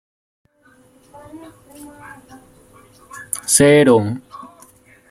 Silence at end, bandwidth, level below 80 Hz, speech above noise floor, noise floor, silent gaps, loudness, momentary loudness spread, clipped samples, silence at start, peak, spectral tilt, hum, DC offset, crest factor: 0.65 s; 16 kHz; -54 dBFS; 37 dB; -53 dBFS; none; -14 LUFS; 29 LU; under 0.1%; 1.35 s; 0 dBFS; -4 dB/octave; none; under 0.1%; 20 dB